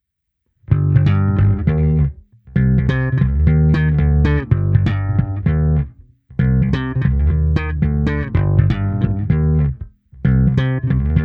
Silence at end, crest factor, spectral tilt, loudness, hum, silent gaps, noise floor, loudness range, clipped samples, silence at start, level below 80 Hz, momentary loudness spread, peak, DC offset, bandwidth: 0 s; 16 dB; -10 dB/octave; -17 LUFS; none; none; -73 dBFS; 2 LU; under 0.1%; 0.7 s; -22 dBFS; 6 LU; 0 dBFS; under 0.1%; 4.9 kHz